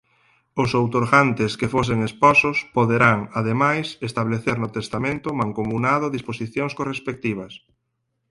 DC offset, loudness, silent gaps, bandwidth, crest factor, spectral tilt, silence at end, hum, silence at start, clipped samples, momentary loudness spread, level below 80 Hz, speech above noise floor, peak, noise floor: under 0.1%; -21 LUFS; none; 11.5 kHz; 20 dB; -6.5 dB/octave; 0.75 s; none; 0.55 s; under 0.1%; 11 LU; -52 dBFS; 54 dB; -2 dBFS; -75 dBFS